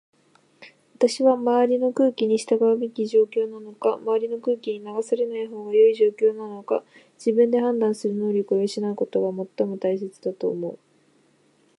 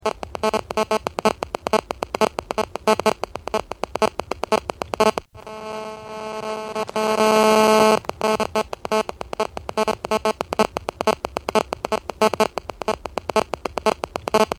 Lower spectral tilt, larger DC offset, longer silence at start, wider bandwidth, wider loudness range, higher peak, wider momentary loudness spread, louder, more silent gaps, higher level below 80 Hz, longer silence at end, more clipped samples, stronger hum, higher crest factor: first, -6 dB/octave vs -3.5 dB/octave; neither; first, 0.6 s vs 0.05 s; second, 11 kHz vs 16.5 kHz; about the same, 4 LU vs 5 LU; second, -6 dBFS vs -2 dBFS; second, 9 LU vs 12 LU; about the same, -23 LUFS vs -22 LUFS; neither; second, -80 dBFS vs -48 dBFS; first, 1.05 s vs 0.05 s; neither; neither; about the same, 16 dB vs 20 dB